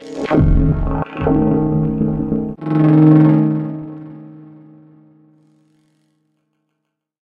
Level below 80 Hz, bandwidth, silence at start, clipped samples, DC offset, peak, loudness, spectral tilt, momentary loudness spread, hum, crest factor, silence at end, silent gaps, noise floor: -26 dBFS; 4.6 kHz; 0 s; under 0.1%; under 0.1%; 0 dBFS; -15 LUFS; -10.5 dB/octave; 19 LU; none; 16 dB; 2.8 s; none; -75 dBFS